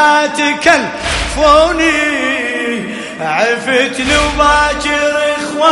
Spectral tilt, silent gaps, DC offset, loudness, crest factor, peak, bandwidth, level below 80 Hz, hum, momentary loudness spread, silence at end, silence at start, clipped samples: -3 dB/octave; none; under 0.1%; -12 LUFS; 12 dB; 0 dBFS; 12 kHz; -30 dBFS; none; 8 LU; 0 s; 0 s; 0.2%